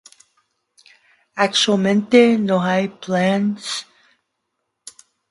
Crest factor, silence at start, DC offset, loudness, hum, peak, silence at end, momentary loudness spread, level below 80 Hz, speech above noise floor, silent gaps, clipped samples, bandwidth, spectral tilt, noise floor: 20 dB; 1.35 s; under 0.1%; -17 LUFS; none; 0 dBFS; 1.5 s; 13 LU; -66 dBFS; 59 dB; none; under 0.1%; 11.5 kHz; -5 dB/octave; -76 dBFS